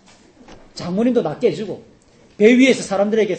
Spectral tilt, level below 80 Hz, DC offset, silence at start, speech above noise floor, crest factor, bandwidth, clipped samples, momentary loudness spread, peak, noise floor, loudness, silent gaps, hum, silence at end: -5.5 dB/octave; -56 dBFS; under 0.1%; 0.5 s; 31 dB; 18 dB; 8.8 kHz; under 0.1%; 19 LU; 0 dBFS; -47 dBFS; -16 LUFS; none; none; 0 s